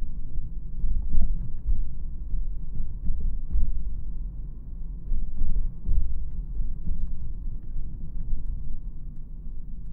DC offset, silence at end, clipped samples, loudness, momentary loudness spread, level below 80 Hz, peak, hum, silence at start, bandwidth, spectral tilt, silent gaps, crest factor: under 0.1%; 0 s; under 0.1%; -36 LUFS; 10 LU; -26 dBFS; -6 dBFS; none; 0 s; 0.6 kHz; -12 dB/octave; none; 16 dB